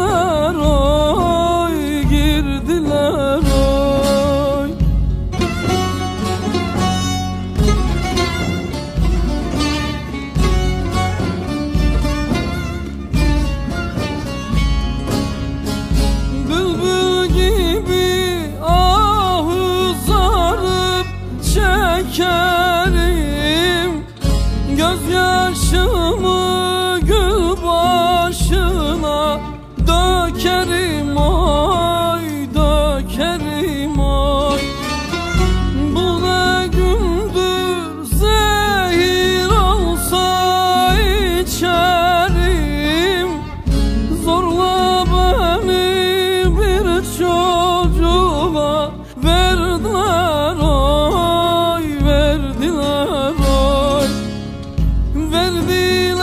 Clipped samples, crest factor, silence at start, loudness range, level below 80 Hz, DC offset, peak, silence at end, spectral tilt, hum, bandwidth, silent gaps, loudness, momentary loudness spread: under 0.1%; 14 dB; 0 s; 4 LU; -20 dBFS; under 0.1%; 0 dBFS; 0 s; -5 dB/octave; none; 15.5 kHz; none; -16 LUFS; 7 LU